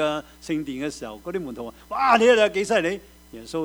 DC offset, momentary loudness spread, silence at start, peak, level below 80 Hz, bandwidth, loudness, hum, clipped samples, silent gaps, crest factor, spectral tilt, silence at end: under 0.1%; 18 LU; 0 s; -2 dBFS; -54 dBFS; over 20 kHz; -22 LUFS; none; under 0.1%; none; 22 dB; -4 dB/octave; 0 s